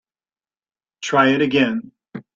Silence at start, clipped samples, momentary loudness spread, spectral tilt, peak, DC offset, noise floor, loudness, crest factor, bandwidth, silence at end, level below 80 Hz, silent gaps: 1 s; under 0.1%; 20 LU; -5 dB/octave; -2 dBFS; under 0.1%; under -90 dBFS; -17 LUFS; 18 dB; 7.6 kHz; 0.15 s; -64 dBFS; none